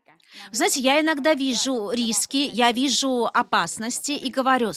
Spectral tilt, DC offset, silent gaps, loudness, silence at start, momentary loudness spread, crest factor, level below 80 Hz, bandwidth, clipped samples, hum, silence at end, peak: -2 dB/octave; under 0.1%; none; -22 LUFS; 0.35 s; 7 LU; 16 dB; -66 dBFS; 16 kHz; under 0.1%; none; 0 s; -6 dBFS